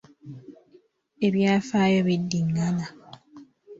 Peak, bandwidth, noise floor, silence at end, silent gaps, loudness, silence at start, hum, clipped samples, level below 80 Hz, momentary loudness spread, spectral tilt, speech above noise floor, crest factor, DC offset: -10 dBFS; 7.8 kHz; -59 dBFS; 0.05 s; none; -24 LUFS; 0.25 s; none; under 0.1%; -62 dBFS; 23 LU; -6.5 dB/octave; 36 dB; 16 dB; under 0.1%